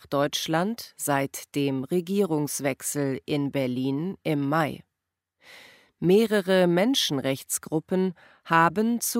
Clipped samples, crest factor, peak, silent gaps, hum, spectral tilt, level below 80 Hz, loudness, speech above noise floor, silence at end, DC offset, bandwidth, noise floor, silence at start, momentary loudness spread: under 0.1%; 20 dB; -6 dBFS; none; none; -4.5 dB/octave; -68 dBFS; -25 LUFS; 60 dB; 0 s; under 0.1%; 16 kHz; -85 dBFS; 0.1 s; 8 LU